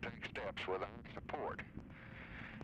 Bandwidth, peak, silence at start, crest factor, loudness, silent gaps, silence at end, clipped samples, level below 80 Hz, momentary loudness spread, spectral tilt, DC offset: 11 kHz; -30 dBFS; 0 s; 16 dB; -46 LUFS; none; 0 s; under 0.1%; -62 dBFS; 11 LU; -6 dB/octave; under 0.1%